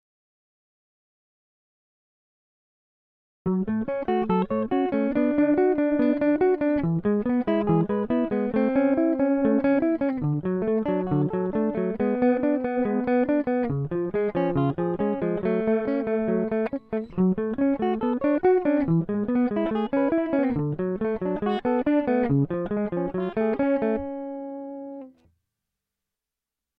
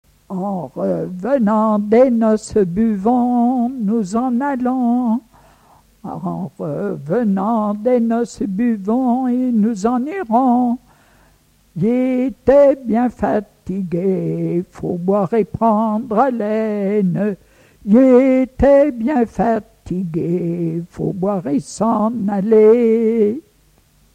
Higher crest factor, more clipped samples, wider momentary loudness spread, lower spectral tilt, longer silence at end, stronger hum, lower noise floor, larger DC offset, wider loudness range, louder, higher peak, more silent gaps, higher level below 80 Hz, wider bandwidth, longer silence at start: about the same, 14 dB vs 16 dB; neither; second, 6 LU vs 12 LU; first, -11.5 dB/octave vs -8.5 dB/octave; first, 1.7 s vs 0.75 s; neither; first, -88 dBFS vs -54 dBFS; neither; about the same, 6 LU vs 5 LU; second, -24 LUFS vs -17 LUFS; second, -10 dBFS vs -2 dBFS; neither; second, -54 dBFS vs -44 dBFS; second, 4.8 kHz vs 9.4 kHz; first, 3.45 s vs 0.3 s